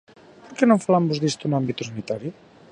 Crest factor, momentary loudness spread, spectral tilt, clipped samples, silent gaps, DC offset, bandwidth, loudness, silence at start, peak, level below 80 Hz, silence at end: 20 dB; 12 LU; -6 dB/octave; under 0.1%; none; under 0.1%; 10.5 kHz; -22 LUFS; 0.45 s; -4 dBFS; -64 dBFS; 0.4 s